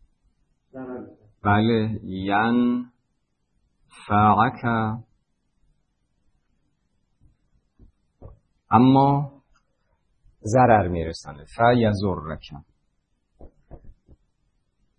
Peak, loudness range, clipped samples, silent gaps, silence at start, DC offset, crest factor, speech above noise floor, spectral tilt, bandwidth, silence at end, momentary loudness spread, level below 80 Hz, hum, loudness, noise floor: -2 dBFS; 5 LU; under 0.1%; none; 0.75 s; under 0.1%; 22 dB; 53 dB; -7.5 dB/octave; 9.8 kHz; 1.1 s; 20 LU; -52 dBFS; none; -21 LUFS; -74 dBFS